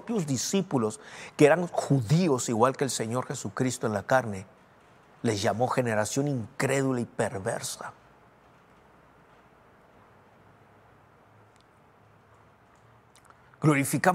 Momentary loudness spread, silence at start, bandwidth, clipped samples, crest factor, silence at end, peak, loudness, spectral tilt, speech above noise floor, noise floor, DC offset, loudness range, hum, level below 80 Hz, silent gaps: 10 LU; 0.05 s; 16 kHz; under 0.1%; 24 dB; 0 s; -6 dBFS; -27 LUFS; -5 dB/octave; 32 dB; -59 dBFS; under 0.1%; 11 LU; none; -70 dBFS; none